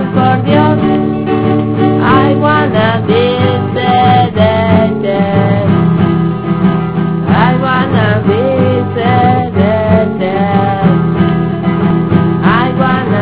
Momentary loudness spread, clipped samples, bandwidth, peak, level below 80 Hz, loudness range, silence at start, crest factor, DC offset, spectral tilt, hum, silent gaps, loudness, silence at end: 4 LU; 0.4%; 4 kHz; 0 dBFS; -32 dBFS; 1 LU; 0 s; 10 dB; 1%; -11.5 dB/octave; none; none; -10 LUFS; 0 s